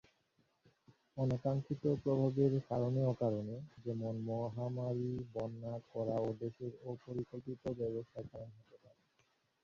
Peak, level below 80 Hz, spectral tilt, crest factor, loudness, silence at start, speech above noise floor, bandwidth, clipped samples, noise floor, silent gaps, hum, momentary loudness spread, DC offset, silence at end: -20 dBFS; -68 dBFS; -10 dB/octave; 18 dB; -39 LUFS; 1.15 s; 40 dB; 7 kHz; under 0.1%; -78 dBFS; none; none; 12 LU; under 0.1%; 0.9 s